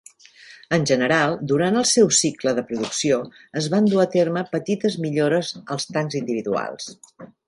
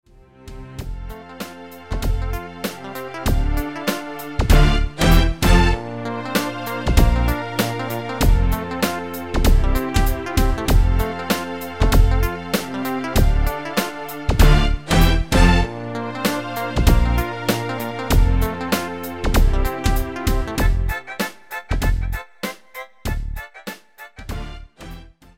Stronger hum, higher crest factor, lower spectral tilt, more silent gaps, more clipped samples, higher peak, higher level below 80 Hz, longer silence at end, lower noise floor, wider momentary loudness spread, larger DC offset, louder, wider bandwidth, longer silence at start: neither; about the same, 18 dB vs 18 dB; second, -4 dB/octave vs -5.5 dB/octave; neither; neither; second, -4 dBFS vs 0 dBFS; second, -64 dBFS vs -20 dBFS; second, 0.2 s vs 0.35 s; first, -47 dBFS vs -41 dBFS; second, 10 LU vs 17 LU; second, under 0.1% vs 0.7%; about the same, -21 LUFS vs -21 LUFS; second, 11.5 kHz vs 16.5 kHz; about the same, 0.5 s vs 0.4 s